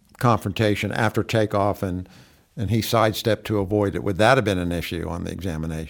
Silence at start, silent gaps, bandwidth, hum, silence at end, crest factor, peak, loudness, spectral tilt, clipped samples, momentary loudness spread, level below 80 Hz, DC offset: 0.2 s; none; 19.5 kHz; none; 0 s; 20 dB; -2 dBFS; -22 LUFS; -6 dB/octave; under 0.1%; 10 LU; -44 dBFS; under 0.1%